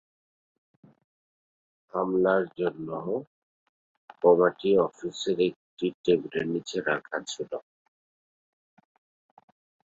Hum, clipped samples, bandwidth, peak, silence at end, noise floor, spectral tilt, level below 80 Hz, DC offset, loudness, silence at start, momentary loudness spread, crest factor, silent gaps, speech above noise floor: none; under 0.1%; 8 kHz; -8 dBFS; 2.3 s; under -90 dBFS; -5.5 dB/octave; -70 dBFS; under 0.1%; -27 LUFS; 1.95 s; 12 LU; 22 dB; 3.27-4.08 s, 5.56-5.77 s, 5.94-6.04 s; over 64 dB